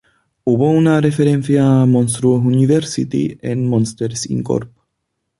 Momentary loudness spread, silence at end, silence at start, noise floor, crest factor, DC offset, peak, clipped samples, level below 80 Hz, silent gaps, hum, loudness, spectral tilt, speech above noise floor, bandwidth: 9 LU; 0.75 s; 0.45 s; -73 dBFS; 14 dB; under 0.1%; -2 dBFS; under 0.1%; -50 dBFS; none; none; -15 LUFS; -7 dB/octave; 59 dB; 11.5 kHz